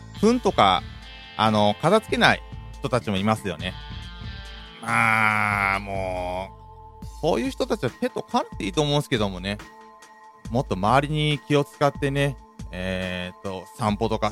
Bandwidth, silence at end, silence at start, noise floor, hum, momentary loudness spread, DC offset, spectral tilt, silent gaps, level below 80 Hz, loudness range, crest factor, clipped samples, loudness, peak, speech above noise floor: 15.5 kHz; 0 s; 0 s; -48 dBFS; none; 18 LU; under 0.1%; -5.5 dB/octave; none; -42 dBFS; 5 LU; 22 dB; under 0.1%; -23 LUFS; -2 dBFS; 25 dB